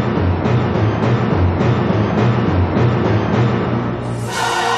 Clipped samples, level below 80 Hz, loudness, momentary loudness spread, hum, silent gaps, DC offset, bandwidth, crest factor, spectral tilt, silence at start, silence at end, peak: under 0.1%; -34 dBFS; -16 LUFS; 4 LU; none; none; under 0.1%; 12 kHz; 12 dB; -7 dB/octave; 0 s; 0 s; -2 dBFS